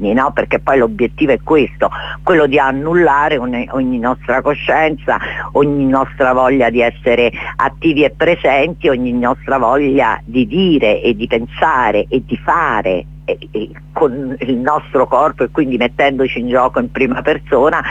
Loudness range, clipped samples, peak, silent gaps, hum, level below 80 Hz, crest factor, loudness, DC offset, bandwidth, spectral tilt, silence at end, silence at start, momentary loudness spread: 3 LU; under 0.1%; 0 dBFS; none; none; -36 dBFS; 14 dB; -14 LUFS; under 0.1%; 8 kHz; -7 dB/octave; 0 s; 0 s; 6 LU